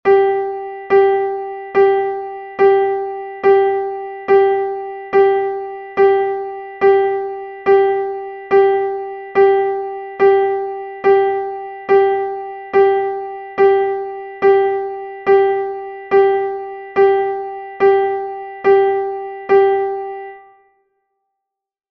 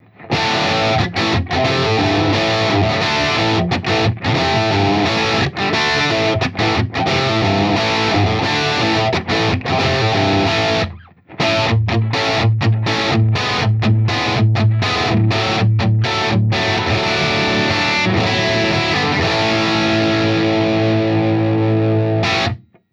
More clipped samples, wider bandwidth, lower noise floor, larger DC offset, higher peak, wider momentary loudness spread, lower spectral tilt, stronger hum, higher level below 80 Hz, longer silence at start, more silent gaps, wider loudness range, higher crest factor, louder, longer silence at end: neither; second, 5.2 kHz vs 8.2 kHz; first, -80 dBFS vs -36 dBFS; neither; about the same, -2 dBFS vs -4 dBFS; first, 13 LU vs 2 LU; first, -7 dB/octave vs -5.5 dB/octave; neither; second, -58 dBFS vs -40 dBFS; second, 0.05 s vs 0.2 s; neither; about the same, 1 LU vs 1 LU; about the same, 14 dB vs 12 dB; about the same, -16 LUFS vs -16 LUFS; first, 1.5 s vs 0.35 s